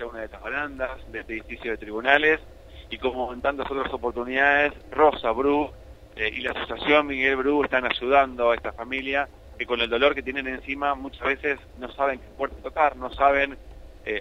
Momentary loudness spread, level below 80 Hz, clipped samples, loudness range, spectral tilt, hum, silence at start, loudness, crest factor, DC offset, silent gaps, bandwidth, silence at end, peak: 13 LU; -46 dBFS; under 0.1%; 3 LU; -5.5 dB/octave; none; 0 s; -24 LUFS; 22 dB; under 0.1%; none; 10.5 kHz; 0 s; -2 dBFS